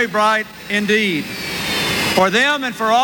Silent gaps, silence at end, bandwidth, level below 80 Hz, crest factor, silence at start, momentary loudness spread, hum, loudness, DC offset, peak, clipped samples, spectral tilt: none; 0 s; 18 kHz; -48 dBFS; 14 dB; 0 s; 8 LU; none; -17 LUFS; under 0.1%; -2 dBFS; under 0.1%; -3.5 dB/octave